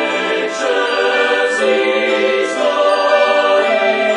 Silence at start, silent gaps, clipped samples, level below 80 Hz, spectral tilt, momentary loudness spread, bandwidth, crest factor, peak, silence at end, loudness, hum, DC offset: 0 s; none; under 0.1%; -64 dBFS; -2.5 dB/octave; 4 LU; 10.5 kHz; 14 dB; 0 dBFS; 0 s; -14 LUFS; none; under 0.1%